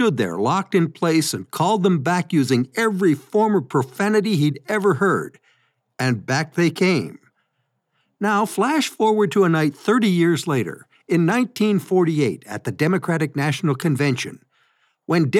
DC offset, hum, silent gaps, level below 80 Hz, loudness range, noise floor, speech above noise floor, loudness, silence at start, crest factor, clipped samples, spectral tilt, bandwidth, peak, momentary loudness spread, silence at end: under 0.1%; none; none; -76 dBFS; 3 LU; -72 dBFS; 53 dB; -20 LUFS; 0 s; 14 dB; under 0.1%; -6 dB/octave; 15.5 kHz; -6 dBFS; 6 LU; 0 s